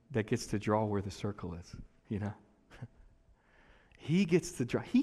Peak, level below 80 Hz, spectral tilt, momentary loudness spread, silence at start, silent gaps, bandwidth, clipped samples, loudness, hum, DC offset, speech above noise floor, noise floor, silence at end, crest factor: -16 dBFS; -58 dBFS; -6.5 dB/octave; 21 LU; 0.1 s; none; 13.5 kHz; under 0.1%; -34 LUFS; none; under 0.1%; 32 dB; -65 dBFS; 0 s; 20 dB